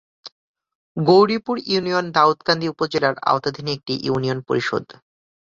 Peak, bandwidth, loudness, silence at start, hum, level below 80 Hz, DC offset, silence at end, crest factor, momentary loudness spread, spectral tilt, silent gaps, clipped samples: -2 dBFS; 7.6 kHz; -20 LUFS; 0.25 s; none; -60 dBFS; under 0.1%; 0.7 s; 20 dB; 10 LU; -6 dB/octave; 0.32-0.54 s, 0.75-0.95 s; under 0.1%